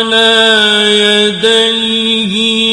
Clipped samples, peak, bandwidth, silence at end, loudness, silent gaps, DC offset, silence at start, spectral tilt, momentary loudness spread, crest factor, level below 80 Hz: 0.2%; 0 dBFS; 12 kHz; 0 s; -8 LUFS; none; under 0.1%; 0 s; -2.5 dB/octave; 5 LU; 10 dB; -50 dBFS